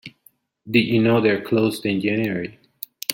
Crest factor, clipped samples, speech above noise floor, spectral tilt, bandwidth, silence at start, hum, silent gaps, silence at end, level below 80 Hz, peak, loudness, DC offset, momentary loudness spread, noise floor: 20 dB; under 0.1%; 38 dB; -5.5 dB/octave; 17 kHz; 0.05 s; none; none; 0 s; -60 dBFS; 0 dBFS; -20 LUFS; under 0.1%; 16 LU; -58 dBFS